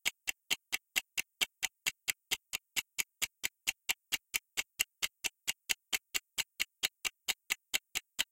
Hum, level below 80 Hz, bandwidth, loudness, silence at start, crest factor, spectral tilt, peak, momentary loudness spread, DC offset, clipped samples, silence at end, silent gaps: none; -74 dBFS; 17 kHz; -36 LUFS; 0.05 s; 30 dB; 2 dB/octave; -10 dBFS; 4 LU; under 0.1%; under 0.1%; 0.1 s; none